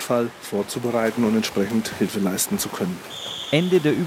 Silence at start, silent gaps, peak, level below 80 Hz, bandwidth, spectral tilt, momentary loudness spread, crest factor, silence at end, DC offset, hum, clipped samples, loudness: 0 s; none; -6 dBFS; -60 dBFS; 17 kHz; -4.5 dB/octave; 9 LU; 16 dB; 0 s; under 0.1%; none; under 0.1%; -23 LUFS